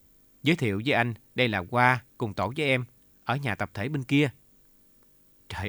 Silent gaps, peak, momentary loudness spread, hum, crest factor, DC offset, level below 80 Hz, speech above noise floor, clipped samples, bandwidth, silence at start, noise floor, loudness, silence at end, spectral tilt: none; -6 dBFS; 9 LU; none; 22 dB; under 0.1%; -60 dBFS; 33 dB; under 0.1%; over 20 kHz; 0.45 s; -60 dBFS; -27 LUFS; 0 s; -6 dB/octave